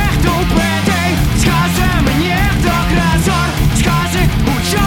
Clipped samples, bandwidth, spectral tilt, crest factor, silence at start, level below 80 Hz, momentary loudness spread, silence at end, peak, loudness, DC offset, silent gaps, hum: under 0.1%; 18.5 kHz; -5 dB/octave; 12 dB; 0 s; -20 dBFS; 2 LU; 0 s; 0 dBFS; -13 LUFS; under 0.1%; none; none